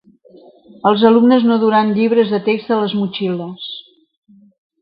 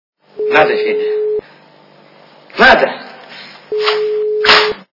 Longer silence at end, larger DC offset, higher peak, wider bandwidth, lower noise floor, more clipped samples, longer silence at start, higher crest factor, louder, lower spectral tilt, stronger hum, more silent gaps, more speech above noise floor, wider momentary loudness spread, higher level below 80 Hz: first, 1 s vs 0.1 s; neither; about the same, 0 dBFS vs 0 dBFS; second, 5.2 kHz vs 6 kHz; about the same, -45 dBFS vs -44 dBFS; second, under 0.1% vs 0.4%; first, 0.85 s vs 0.35 s; about the same, 16 dB vs 14 dB; about the same, -14 LUFS vs -12 LUFS; first, -10.5 dB/octave vs -3.5 dB/octave; neither; neither; about the same, 31 dB vs 33 dB; second, 15 LU vs 22 LU; second, -62 dBFS vs -48 dBFS